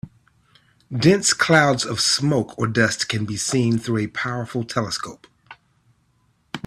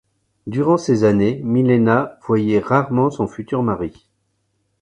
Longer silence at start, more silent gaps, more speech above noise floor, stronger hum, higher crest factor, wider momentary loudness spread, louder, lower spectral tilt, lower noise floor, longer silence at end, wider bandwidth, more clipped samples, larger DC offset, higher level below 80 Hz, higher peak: second, 0.05 s vs 0.45 s; neither; second, 43 dB vs 51 dB; neither; about the same, 20 dB vs 18 dB; about the same, 11 LU vs 10 LU; about the same, -20 LUFS vs -18 LUFS; second, -4 dB/octave vs -8 dB/octave; second, -64 dBFS vs -68 dBFS; second, 0.1 s vs 0.9 s; first, 14 kHz vs 9.6 kHz; neither; neither; second, -56 dBFS vs -50 dBFS; about the same, -2 dBFS vs 0 dBFS